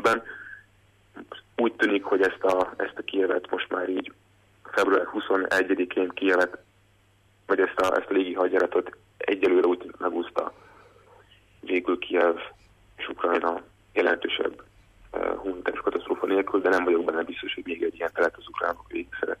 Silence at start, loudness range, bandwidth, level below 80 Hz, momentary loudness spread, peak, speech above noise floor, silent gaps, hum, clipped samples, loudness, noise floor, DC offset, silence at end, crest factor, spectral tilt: 0 s; 3 LU; 14 kHz; -62 dBFS; 12 LU; -10 dBFS; 36 dB; none; none; under 0.1%; -26 LUFS; -62 dBFS; under 0.1%; 0.05 s; 16 dB; -4.5 dB/octave